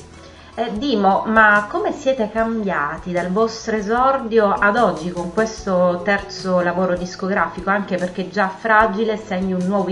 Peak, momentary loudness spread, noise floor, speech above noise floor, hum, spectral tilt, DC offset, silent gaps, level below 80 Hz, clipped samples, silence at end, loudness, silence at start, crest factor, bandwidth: 0 dBFS; 8 LU; -41 dBFS; 22 dB; none; -5.5 dB/octave; under 0.1%; none; -46 dBFS; under 0.1%; 0 s; -18 LUFS; 0 s; 18 dB; 10.5 kHz